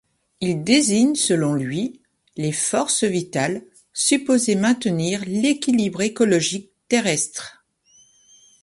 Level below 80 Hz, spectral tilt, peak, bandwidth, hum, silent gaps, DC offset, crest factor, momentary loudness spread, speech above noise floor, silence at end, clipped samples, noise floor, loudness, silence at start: -62 dBFS; -4 dB/octave; -4 dBFS; 11.5 kHz; none; none; under 0.1%; 18 dB; 10 LU; 37 dB; 1.1 s; under 0.1%; -56 dBFS; -20 LUFS; 0.4 s